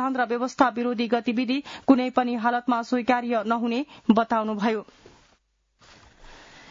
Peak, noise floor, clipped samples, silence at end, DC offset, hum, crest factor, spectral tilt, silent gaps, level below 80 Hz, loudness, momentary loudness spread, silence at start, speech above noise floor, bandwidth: -6 dBFS; -67 dBFS; under 0.1%; 0.35 s; under 0.1%; none; 20 dB; -5.5 dB/octave; none; -62 dBFS; -24 LUFS; 6 LU; 0 s; 43 dB; 7.6 kHz